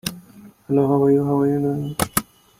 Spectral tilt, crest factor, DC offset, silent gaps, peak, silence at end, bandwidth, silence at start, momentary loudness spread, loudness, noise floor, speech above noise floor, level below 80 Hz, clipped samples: -6 dB/octave; 20 dB; under 0.1%; none; 0 dBFS; 0.35 s; 16.5 kHz; 0.05 s; 7 LU; -20 LUFS; -46 dBFS; 27 dB; -50 dBFS; under 0.1%